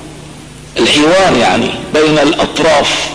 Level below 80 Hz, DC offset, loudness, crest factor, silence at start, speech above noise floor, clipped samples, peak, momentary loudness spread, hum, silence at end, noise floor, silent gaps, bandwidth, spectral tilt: -38 dBFS; under 0.1%; -10 LUFS; 8 dB; 0 s; 21 dB; under 0.1%; -2 dBFS; 10 LU; none; 0 s; -31 dBFS; none; 11 kHz; -3.5 dB/octave